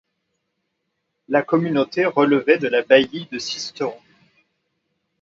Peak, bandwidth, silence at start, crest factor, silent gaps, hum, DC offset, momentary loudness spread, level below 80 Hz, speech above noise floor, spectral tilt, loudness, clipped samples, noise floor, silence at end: 0 dBFS; 7.8 kHz; 1.3 s; 20 dB; none; none; under 0.1%; 11 LU; -66 dBFS; 56 dB; -5 dB/octave; -19 LUFS; under 0.1%; -75 dBFS; 1.25 s